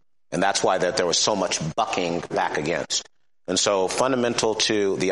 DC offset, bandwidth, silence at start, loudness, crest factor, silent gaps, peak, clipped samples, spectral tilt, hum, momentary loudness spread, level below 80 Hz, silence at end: 0.1%; 11.5 kHz; 0.3 s; -23 LUFS; 18 dB; none; -6 dBFS; under 0.1%; -2.5 dB/octave; none; 5 LU; -60 dBFS; 0 s